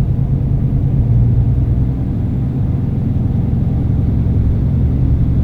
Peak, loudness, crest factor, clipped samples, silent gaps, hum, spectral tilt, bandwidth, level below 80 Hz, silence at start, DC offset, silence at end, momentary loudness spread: -2 dBFS; -16 LUFS; 10 dB; under 0.1%; none; none; -11.5 dB/octave; 3.8 kHz; -20 dBFS; 0 s; under 0.1%; 0 s; 4 LU